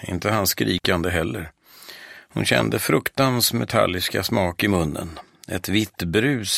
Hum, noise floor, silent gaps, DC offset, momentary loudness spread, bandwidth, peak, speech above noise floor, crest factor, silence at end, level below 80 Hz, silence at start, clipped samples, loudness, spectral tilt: none; -44 dBFS; none; under 0.1%; 17 LU; 16 kHz; -2 dBFS; 22 dB; 20 dB; 0 s; -46 dBFS; 0 s; under 0.1%; -21 LUFS; -4 dB/octave